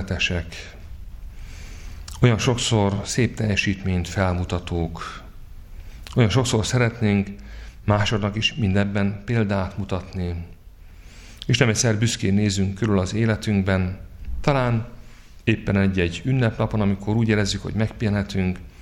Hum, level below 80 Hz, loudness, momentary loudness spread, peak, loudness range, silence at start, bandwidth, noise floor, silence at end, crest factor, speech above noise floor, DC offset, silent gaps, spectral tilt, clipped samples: none; -38 dBFS; -22 LUFS; 19 LU; -2 dBFS; 3 LU; 0 s; 12.5 kHz; -43 dBFS; 0 s; 22 dB; 22 dB; under 0.1%; none; -5.5 dB/octave; under 0.1%